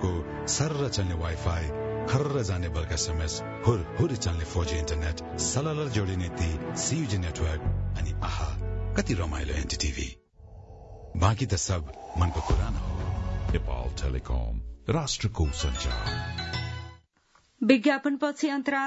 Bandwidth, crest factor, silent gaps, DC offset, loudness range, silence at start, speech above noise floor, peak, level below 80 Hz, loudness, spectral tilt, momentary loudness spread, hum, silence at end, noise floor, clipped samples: 8 kHz; 22 dB; none; under 0.1%; 3 LU; 0 s; 37 dB; -6 dBFS; -36 dBFS; -29 LUFS; -5 dB/octave; 6 LU; none; 0 s; -65 dBFS; under 0.1%